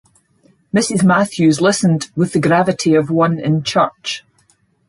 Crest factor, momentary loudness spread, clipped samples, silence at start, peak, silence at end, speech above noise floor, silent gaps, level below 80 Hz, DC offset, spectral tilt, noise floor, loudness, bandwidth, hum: 14 dB; 6 LU; under 0.1%; 0.75 s; -2 dBFS; 0.7 s; 43 dB; none; -56 dBFS; under 0.1%; -5.5 dB/octave; -58 dBFS; -15 LUFS; 11.5 kHz; none